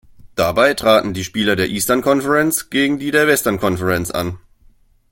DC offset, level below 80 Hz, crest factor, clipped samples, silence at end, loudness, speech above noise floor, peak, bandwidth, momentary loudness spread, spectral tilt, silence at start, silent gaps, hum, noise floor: under 0.1%; -46 dBFS; 16 dB; under 0.1%; 0.75 s; -16 LUFS; 35 dB; 0 dBFS; 17 kHz; 8 LU; -4 dB/octave; 0.25 s; none; none; -51 dBFS